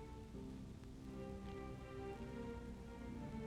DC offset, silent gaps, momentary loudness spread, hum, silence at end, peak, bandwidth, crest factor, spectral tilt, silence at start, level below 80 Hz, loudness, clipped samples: under 0.1%; none; 4 LU; none; 0 s; -38 dBFS; 15.5 kHz; 12 dB; -7 dB/octave; 0 s; -58 dBFS; -52 LUFS; under 0.1%